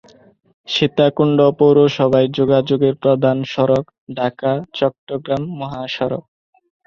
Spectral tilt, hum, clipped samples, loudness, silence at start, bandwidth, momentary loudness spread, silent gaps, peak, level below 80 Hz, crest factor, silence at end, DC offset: -7.5 dB/octave; none; under 0.1%; -17 LUFS; 0.7 s; 7 kHz; 11 LU; 3.98-4.07 s, 4.98-5.07 s; -2 dBFS; -54 dBFS; 16 dB; 0.65 s; under 0.1%